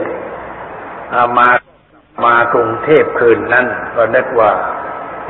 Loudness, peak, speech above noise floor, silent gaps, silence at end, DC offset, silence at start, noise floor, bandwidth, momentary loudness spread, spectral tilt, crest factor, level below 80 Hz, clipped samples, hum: -12 LUFS; 0 dBFS; 35 dB; none; 0 s; under 0.1%; 0 s; -46 dBFS; 4.2 kHz; 17 LU; -8.5 dB/octave; 14 dB; -48 dBFS; under 0.1%; none